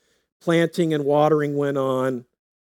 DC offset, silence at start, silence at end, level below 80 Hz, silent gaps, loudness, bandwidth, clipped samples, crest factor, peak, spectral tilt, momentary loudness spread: under 0.1%; 0.45 s; 0.5 s; -80 dBFS; none; -21 LUFS; 17 kHz; under 0.1%; 16 dB; -6 dBFS; -7 dB/octave; 8 LU